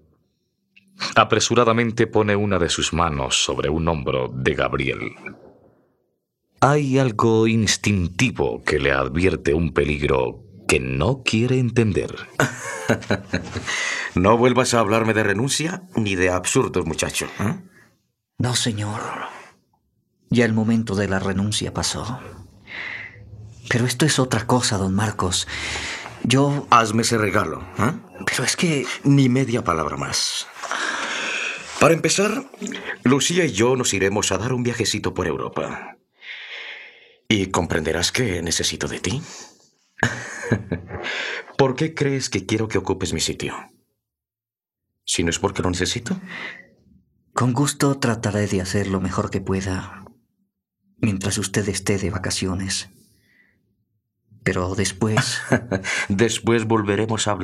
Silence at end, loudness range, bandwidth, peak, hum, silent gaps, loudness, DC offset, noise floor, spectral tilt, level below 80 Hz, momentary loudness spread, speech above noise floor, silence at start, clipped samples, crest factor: 0 s; 6 LU; 14.5 kHz; 0 dBFS; none; none; -21 LUFS; under 0.1%; under -90 dBFS; -4.5 dB/octave; -46 dBFS; 11 LU; over 69 dB; 1 s; under 0.1%; 20 dB